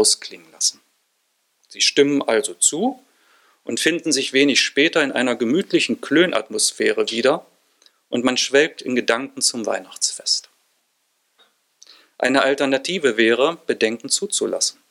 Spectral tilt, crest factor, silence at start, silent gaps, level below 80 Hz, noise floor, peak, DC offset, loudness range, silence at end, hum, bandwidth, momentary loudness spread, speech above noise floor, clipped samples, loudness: -2 dB/octave; 18 dB; 0 s; none; -70 dBFS; -68 dBFS; -2 dBFS; under 0.1%; 5 LU; 0.2 s; none; 14.5 kHz; 6 LU; 49 dB; under 0.1%; -19 LUFS